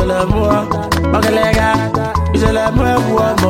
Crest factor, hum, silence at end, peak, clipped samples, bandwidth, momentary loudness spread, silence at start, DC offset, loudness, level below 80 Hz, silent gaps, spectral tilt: 12 dB; none; 0 s; 0 dBFS; under 0.1%; 16.5 kHz; 3 LU; 0 s; under 0.1%; -14 LUFS; -24 dBFS; none; -6 dB/octave